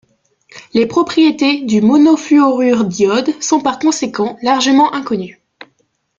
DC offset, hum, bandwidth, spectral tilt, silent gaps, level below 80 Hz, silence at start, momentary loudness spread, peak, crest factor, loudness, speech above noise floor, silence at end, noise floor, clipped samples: under 0.1%; none; 7.6 kHz; -4.5 dB/octave; none; -56 dBFS; 0.55 s; 9 LU; 0 dBFS; 12 dB; -13 LUFS; 49 dB; 0.85 s; -62 dBFS; under 0.1%